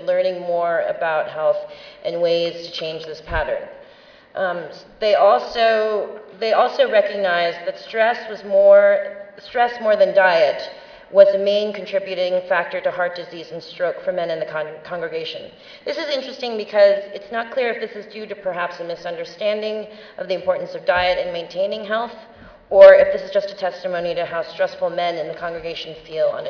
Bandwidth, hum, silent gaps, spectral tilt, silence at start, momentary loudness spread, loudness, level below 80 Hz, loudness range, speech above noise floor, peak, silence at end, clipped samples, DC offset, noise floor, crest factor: 5.4 kHz; none; none; -5 dB/octave; 0 s; 16 LU; -19 LUFS; -50 dBFS; 9 LU; 28 dB; 0 dBFS; 0 s; under 0.1%; under 0.1%; -47 dBFS; 20 dB